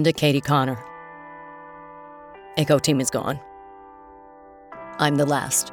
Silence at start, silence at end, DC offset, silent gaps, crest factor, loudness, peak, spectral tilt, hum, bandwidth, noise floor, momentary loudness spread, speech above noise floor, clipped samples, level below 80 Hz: 0 s; 0 s; under 0.1%; none; 20 dB; -22 LUFS; -4 dBFS; -4.5 dB/octave; none; 19.5 kHz; -46 dBFS; 23 LU; 25 dB; under 0.1%; -58 dBFS